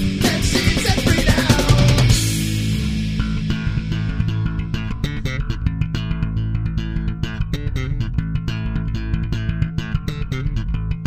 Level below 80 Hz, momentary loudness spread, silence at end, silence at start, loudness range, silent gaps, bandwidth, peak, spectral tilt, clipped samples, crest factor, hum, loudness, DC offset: -26 dBFS; 9 LU; 0 s; 0 s; 7 LU; none; 15.5 kHz; 0 dBFS; -5 dB/octave; under 0.1%; 18 dB; none; -20 LUFS; under 0.1%